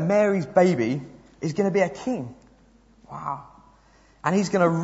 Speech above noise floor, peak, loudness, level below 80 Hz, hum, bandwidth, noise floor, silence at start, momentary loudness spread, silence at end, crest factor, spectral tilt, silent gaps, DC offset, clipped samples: 34 dB; -4 dBFS; -24 LUFS; -60 dBFS; none; 8 kHz; -56 dBFS; 0 s; 16 LU; 0 s; 20 dB; -7 dB/octave; none; under 0.1%; under 0.1%